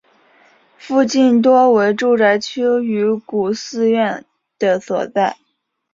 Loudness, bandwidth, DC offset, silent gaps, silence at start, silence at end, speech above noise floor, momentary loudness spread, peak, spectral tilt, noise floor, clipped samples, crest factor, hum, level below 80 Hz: -16 LUFS; 7.6 kHz; under 0.1%; none; 0.85 s; 0.6 s; 55 dB; 9 LU; -2 dBFS; -5 dB/octave; -70 dBFS; under 0.1%; 14 dB; none; -64 dBFS